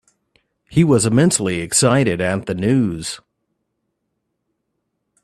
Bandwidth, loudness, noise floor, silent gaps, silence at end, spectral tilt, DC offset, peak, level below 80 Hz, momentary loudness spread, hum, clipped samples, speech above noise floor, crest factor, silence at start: 13.5 kHz; -17 LUFS; -74 dBFS; none; 2.1 s; -5 dB/octave; under 0.1%; -2 dBFS; -50 dBFS; 10 LU; none; under 0.1%; 58 dB; 18 dB; 0.7 s